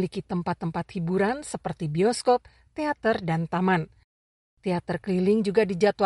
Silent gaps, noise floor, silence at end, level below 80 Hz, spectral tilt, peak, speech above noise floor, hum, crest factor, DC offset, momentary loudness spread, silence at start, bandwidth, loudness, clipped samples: 4.04-4.57 s; under -90 dBFS; 0 s; -58 dBFS; -6.5 dB/octave; -8 dBFS; over 65 dB; none; 18 dB; under 0.1%; 9 LU; 0 s; 11.5 kHz; -26 LUFS; under 0.1%